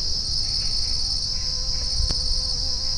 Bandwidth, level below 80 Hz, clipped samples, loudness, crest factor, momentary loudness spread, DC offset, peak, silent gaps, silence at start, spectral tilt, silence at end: 10.5 kHz; -28 dBFS; under 0.1%; -23 LUFS; 14 dB; 2 LU; under 0.1%; -10 dBFS; none; 0 s; -1.5 dB/octave; 0 s